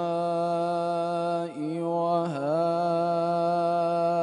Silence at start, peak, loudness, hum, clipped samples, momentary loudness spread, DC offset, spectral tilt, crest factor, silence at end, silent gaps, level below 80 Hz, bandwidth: 0 s; -14 dBFS; -27 LUFS; none; under 0.1%; 4 LU; under 0.1%; -7.5 dB/octave; 12 dB; 0 s; none; -78 dBFS; 10.5 kHz